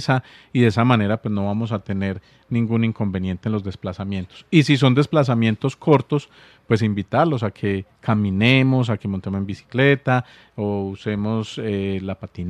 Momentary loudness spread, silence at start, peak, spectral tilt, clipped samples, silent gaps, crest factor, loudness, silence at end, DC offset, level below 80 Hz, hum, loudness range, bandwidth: 11 LU; 0 s; -2 dBFS; -7.5 dB/octave; under 0.1%; none; 20 dB; -21 LUFS; 0 s; under 0.1%; -58 dBFS; none; 3 LU; 10 kHz